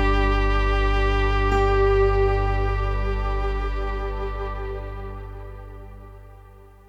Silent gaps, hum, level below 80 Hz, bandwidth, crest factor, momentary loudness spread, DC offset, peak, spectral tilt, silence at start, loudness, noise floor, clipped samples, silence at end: none; 50 Hz at -55 dBFS; -24 dBFS; 7.2 kHz; 14 dB; 20 LU; under 0.1%; -8 dBFS; -7 dB/octave; 0 s; -23 LUFS; -46 dBFS; under 0.1%; 0.25 s